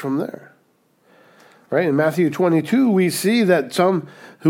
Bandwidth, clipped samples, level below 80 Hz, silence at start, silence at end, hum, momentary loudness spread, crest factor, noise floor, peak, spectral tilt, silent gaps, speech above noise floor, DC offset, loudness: 17.5 kHz; under 0.1%; -74 dBFS; 0 s; 0 s; none; 9 LU; 16 dB; -61 dBFS; -4 dBFS; -6 dB/octave; none; 43 dB; under 0.1%; -18 LUFS